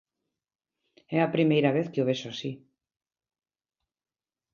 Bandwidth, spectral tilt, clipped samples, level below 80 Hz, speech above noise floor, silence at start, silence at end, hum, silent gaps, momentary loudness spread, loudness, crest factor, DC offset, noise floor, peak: 7.2 kHz; -7 dB/octave; under 0.1%; -74 dBFS; over 64 dB; 1.1 s; 1.95 s; none; none; 14 LU; -27 LUFS; 22 dB; under 0.1%; under -90 dBFS; -8 dBFS